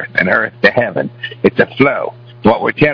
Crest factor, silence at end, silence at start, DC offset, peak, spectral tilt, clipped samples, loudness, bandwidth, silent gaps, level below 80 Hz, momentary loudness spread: 14 dB; 0 s; 0 s; under 0.1%; 0 dBFS; -8 dB/octave; 0.3%; -14 LUFS; 5.4 kHz; none; -44 dBFS; 9 LU